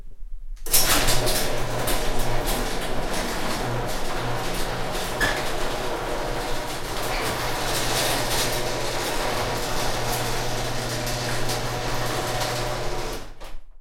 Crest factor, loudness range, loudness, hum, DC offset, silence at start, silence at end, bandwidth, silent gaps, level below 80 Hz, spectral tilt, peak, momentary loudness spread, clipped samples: 22 dB; 3 LU; -25 LUFS; none; under 0.1%; 0 s; 0 s; 16.5 kHz; none; -30 dBFS; -3 dB/octave; -2 dBFS; 7 LU; under 0.1%